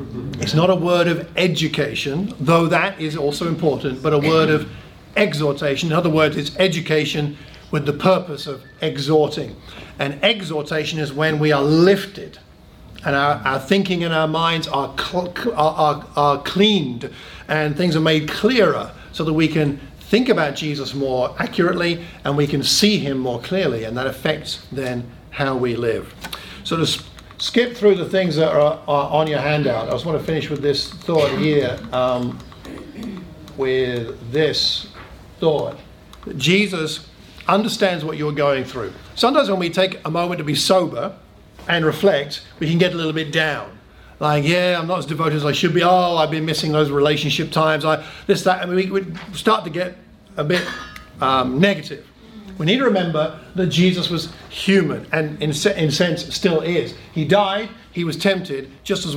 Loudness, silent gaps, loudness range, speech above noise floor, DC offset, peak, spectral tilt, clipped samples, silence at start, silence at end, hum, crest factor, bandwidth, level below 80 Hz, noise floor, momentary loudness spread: -19 LUFS; none; 3 LU; 24 dB; under 0.1%; -2 dBFS; -5 dB/octave; under 0.1%; 0 s; 0 s; none; 18 dB; 17 kHz; -48 dBFS; -43 dBFS; 13 LU